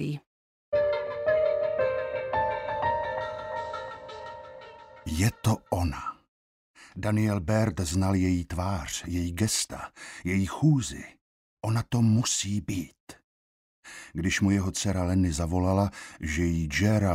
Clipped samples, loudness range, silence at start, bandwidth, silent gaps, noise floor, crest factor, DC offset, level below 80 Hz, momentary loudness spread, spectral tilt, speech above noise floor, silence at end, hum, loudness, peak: under 0.1%; 4 LU; 0 s; 16 kHz; 0.27-0.72 s, 6.28-6.74 s, 11.21-11.57 s, 13.00-13.07 s, 13.24-13.83 s; -47 dBFS; 18 dB; under 0.1%; -46 dBFS; 16 LU; -5.5 dB/octave; 21 dB; 0 s; none; -28 LUFS; -12 dBFS